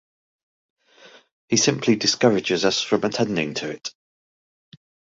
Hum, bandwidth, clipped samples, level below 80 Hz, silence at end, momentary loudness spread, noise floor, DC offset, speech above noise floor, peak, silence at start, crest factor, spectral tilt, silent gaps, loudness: none; 8 kHz; under 0.1%; -62 dBFS; 1.25 s; 11 LU; -51 dBFS; under 0.1%; 30 dB; -2 dBFS; 1.05 s; 22 dB; -3.5 dB/octave; 1.32-1.48 s; -21 LUFS